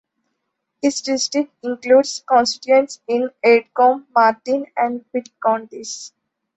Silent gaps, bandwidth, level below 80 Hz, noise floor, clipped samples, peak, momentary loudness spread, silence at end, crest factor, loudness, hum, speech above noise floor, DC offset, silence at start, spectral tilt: none; 8.2 kHz; -66 dBFS; -75 dBFS; under 0.1%; -2 dBFS; 12 LU; 0.5 s; 16 dB; -18 LUFS; none; 58 dB; under 0.1%; 0.85 s; -2.5 dB/octave